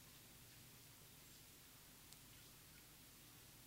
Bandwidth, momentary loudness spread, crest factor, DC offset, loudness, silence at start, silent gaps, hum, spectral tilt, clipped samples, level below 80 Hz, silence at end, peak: 16 kHz; 1 LU; 26 dB; under 0.1%; -61 LUFS; 0 s; none; none; -2.5 dB/octave; under 0.1%; -76 dBFS; 0 s; -38 dBFS